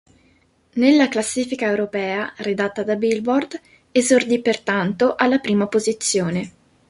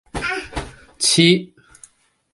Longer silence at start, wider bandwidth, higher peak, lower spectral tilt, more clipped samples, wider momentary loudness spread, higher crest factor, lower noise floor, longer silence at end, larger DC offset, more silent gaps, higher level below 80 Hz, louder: first, 0.75 s vs 0.15 s; about the same, 11.5 kHz vs 11.5 kHz; about the same, -4 dBFS vs -2 dBFS; about the same, -4 dB/octave vs -3.5 dB/octave; neither; second, 8 LU vs 18 LU; about the same, 16 dB vs 20 dB; first, -58 dBFS vs -50 dBFS; second, 0.4 s vs 0.9 s; neither; neither; second, -60 dBFS vs -42 dBFS; second, -20 LUFS vs -17 LUFS